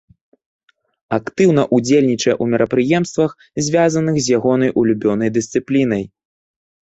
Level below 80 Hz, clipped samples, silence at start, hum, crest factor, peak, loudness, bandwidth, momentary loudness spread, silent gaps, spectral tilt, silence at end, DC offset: -54 dBFS; under 0.1%; 1.1 s; none; 14 dB; -2 dBFS; -16 LUFS; 8.2 kHz; 8 LU; none; -5.5 dB/octave; 0.85 s; under 0.1%